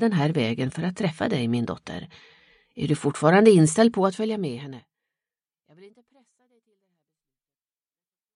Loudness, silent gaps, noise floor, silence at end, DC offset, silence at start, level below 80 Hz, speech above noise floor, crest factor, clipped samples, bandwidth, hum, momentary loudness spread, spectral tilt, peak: -22 LUFS; none; under -90 dBFS; 2.5 s; under 0.1%; 0 s; -62 dBFS; over 68 dB; 22 dB; under 0.1%; 11 kHz; none; 18 LU; -6 dB/octave; -4 dBFS